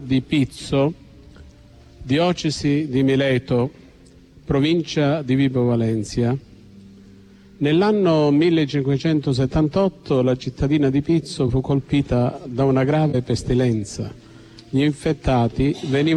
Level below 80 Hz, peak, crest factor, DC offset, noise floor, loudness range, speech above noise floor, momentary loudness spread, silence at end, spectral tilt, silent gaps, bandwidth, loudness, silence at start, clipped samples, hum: -40 dBFS; -6 dBFS; 14 dB; under 0.1%; -48 dBFS; 3 LU; 29 dB; 6 LU; 0 s; -7 dB/octave; none; 11 kHz; -20 LUFS; 0 s; under 0.1%; none